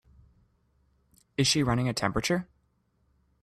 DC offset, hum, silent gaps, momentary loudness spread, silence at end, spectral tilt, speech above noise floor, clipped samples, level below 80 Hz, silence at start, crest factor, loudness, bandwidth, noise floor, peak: under 0.1%; none; none; 7 LU; 1 s; -4 dB/octave; 44 dB; under 0.1%; -52 dBFS; 1.4 s; 22 dB; -27 LUFS; 13.5 kHz; -71 dBFS; -10 dBFS